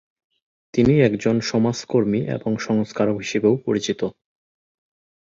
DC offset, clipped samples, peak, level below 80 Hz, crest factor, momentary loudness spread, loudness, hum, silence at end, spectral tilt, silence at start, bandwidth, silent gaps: under 0.1%; under 0.1%; -4 dBFS; -52 dBFS; 18 dB; 8 LU; -21 LUFS; none; 1.1 s; -6.5 dB/octave; 0.75 s; 7.6 kHz; none